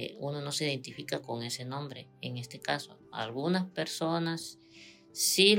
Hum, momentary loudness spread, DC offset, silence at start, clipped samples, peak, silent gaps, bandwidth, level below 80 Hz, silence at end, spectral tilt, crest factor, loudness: none; 13 LU; under 0.1%; 0 s; under 0.1%; -8 dBFS; none; 16 kHz; -80 dBFS; 0 s; -3.5 dB/octave; 24 dB; -33 LUFS